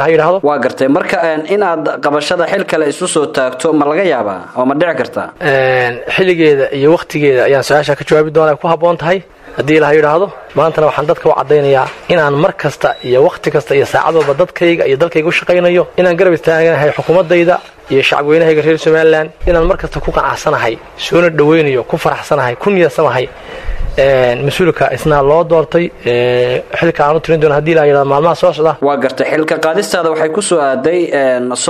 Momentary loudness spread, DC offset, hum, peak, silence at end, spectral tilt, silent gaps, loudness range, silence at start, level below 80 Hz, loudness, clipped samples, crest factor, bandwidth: 5 LU; under 0.1%; none; 0 dBFS; 0 s; -5.5 dB/octave; none; 2 LU; 0 s; -32 dBFS; -11 LUFS; under 0.1%; 10 dB; 14 kHz